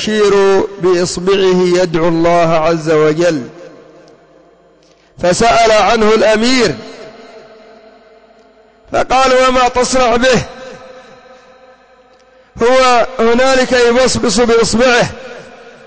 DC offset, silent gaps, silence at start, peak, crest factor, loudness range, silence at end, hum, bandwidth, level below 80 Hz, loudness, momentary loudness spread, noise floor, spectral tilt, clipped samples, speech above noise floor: under 0.1%; none; 0 s; -2 dBFS; 10 dB; 5 LU; 0 s; none; 8 kHz; -38 dBFS; -11 LUFS; 11 LU; -47 dBFS; -4 dB/octave; under 0.1%; 37 dB